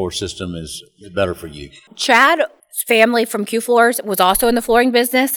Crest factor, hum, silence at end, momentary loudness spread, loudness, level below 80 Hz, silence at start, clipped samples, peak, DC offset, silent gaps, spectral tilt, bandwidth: 16 dB; none; 0 s; 17 LU; -15 LUFS; -44 dBFS; 0 s; under 0.1%; 0 dBFS; under 0.1%; none; -3 dB/octave; over 20 kHz